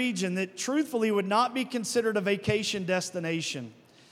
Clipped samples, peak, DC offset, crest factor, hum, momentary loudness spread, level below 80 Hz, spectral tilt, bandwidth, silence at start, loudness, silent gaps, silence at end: under 0.1%; -12 dBFS; under 0.1%; 18 dB; none; 6 LU; -66 dBFS; -4 dB/octave; 16 kHz; 0 s; -28 LUFS; none; 0.4 s